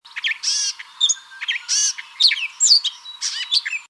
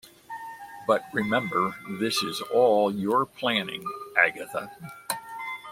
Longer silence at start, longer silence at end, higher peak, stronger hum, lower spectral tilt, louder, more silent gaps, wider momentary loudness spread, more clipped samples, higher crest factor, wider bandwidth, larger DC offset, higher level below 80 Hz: about the same, 0.05 s vs 0.05 s; about the same, 0.05 s vs 0 s; about the same, -2 dBFS vs -4 dBFS; neither; second, 8.5 dB/octave vs -4 dB/octave; first, -18 LUFS vs -26 LUFS; neither; second, 11 LU vs 17 LU; neither; about the same, 20 dB vs 22 dB; second, 11 kHz vs 16.5 kHz; neither; second, -84 dBFS vs -70 dBFS